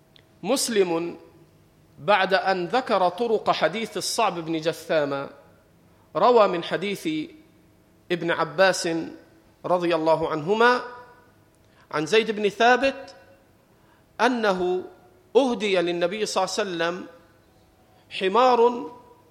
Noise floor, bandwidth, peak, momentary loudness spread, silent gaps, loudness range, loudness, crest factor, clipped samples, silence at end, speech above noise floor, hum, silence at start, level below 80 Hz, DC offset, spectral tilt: -58 dBFS; 16 kHz; -4 dBFS; 14 LU; none; 2 LU; -23 LUFS; 20 dB; under 0.1%; 0.3 s; 35 dB; none; 0.45 s; -66 dBFS; under 0.1%; -4 dB/octave